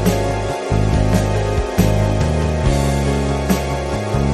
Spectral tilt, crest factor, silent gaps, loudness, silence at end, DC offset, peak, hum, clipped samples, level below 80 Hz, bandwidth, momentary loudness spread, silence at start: -6.5 dB/octave; 16 dB; none; -18 LUFS; 0 s; under 0.1%; 0 dBFS; none; under 0.1%; -22 dBFS; 13.5 kHz; 4 LU; 0 s